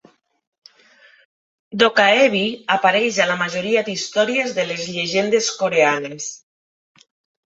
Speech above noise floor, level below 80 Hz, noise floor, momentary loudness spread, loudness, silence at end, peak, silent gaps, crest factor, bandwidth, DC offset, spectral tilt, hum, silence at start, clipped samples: 34 dB; -66 dBFS; -52 dBFS; 10 LU; -18 LUFS; 1.2 s; 0 dBFS; none; 20 dB; 8 kHz; under 0.1%; -3 dB/octave; none; 1.7 s; under 0.1%